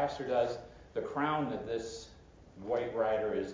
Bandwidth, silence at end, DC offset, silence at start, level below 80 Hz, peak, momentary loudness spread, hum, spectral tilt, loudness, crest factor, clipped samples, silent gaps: 7.6 kHz; 0 s; under 0.1%; 0 s; -60 dBFS; -18 dBFS; 13 LU; none; -5.5 dB/octave; -35 LUFS; 16 dB; under 0.1%; none